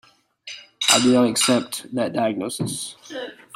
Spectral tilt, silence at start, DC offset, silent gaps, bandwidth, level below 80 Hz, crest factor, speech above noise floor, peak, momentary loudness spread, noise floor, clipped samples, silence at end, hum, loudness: -3 dB/octave; 0.45 s; under 0.1%; none; 16.5 kHz; -64 dBFS; 20 dB; 21 dB; -2 dBFS; 19 LU; -43 dBFS; under 0.1%; 0.25 s; none; -20 LUFS